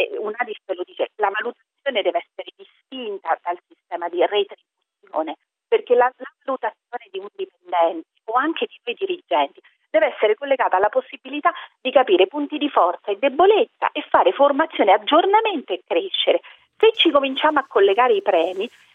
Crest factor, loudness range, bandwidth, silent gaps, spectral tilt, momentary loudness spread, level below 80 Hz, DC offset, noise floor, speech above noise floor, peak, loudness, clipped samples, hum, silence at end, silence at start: 20 dB; 8 LU; 4.2 kHz; none; -5 dB/octave; 15 LU; -70 dBFS; under 0.1%; -63 dBFS; 44 dB; 0 dBFS; -20 LUFS; under 0.1%; none; 0.25 s; 0 s